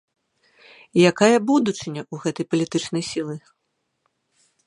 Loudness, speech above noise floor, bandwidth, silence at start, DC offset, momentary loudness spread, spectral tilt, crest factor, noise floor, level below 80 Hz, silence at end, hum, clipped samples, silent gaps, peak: -21 LUFS; 52 dB; 11 kHz; 0.95 s; under 0.1%; 15 LU; -5 dB/octave; 22 dB; -73 dBFS; -66 dBFS; 1.3 s; none; under 0.1%; none; -2 dBFS